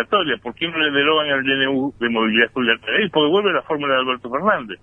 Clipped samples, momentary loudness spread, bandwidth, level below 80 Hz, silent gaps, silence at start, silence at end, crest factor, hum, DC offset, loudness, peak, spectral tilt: under 0.1%; 5 LU; 3.9 kHz; -58 dBFS; none; 0 s; 0.1 s; 16 dB; none; under 0.1%; -18 LUFS; -2 dBFS; -7 dB/octave